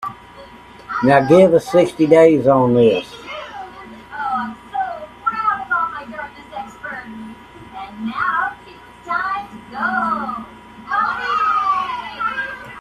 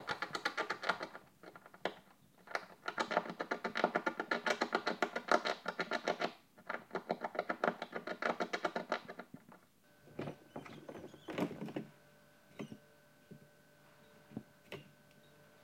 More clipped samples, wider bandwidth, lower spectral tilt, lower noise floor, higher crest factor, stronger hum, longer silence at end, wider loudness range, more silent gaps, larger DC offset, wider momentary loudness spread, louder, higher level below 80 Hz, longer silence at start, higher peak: neither; second, 13 kHz vs 16.5 kHz; first, -6.5 dB/octave vs -4 dB/octave; second, -41 dBFS vs -67 dBFS; second, 18 dB vs 28 dB; neither; second, 0 s vs 0.15 s; about the same, 11 LU vs 12 LU; neither; neither; about the same, 22 LU vs 21 LU; first, -17 LUFS vs -40 LUFS; first, -52 dBFS vs -84 dBFS; about the same, 0 s vs 0 s; first, 0 dBFS vs -14 dBFS